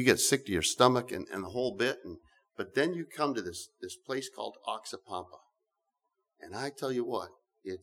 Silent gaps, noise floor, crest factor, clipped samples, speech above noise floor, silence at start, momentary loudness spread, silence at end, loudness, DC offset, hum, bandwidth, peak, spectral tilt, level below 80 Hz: none; -84 dBFS; 26 dB; under 0.1%; 52 dB; 0 s; 19 LU; 0.05 s; -32 LUFS; under 0.1%; none; 19 kHz; -8 dBFS; -3.5 dB/octave; -66 dBFS